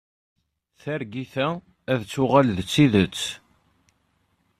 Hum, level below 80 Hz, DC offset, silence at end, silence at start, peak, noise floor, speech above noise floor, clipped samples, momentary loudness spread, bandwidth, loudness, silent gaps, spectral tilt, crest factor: none; -56 dBFS; under 0.1%; 1.25 s; 0.85 s; -4 dBFS; -68 dBFS; 46 dB; under 0.1%; 14 LU; 14.5 kHz; -23 LUFS; none; -6 dB/octave; 22 dB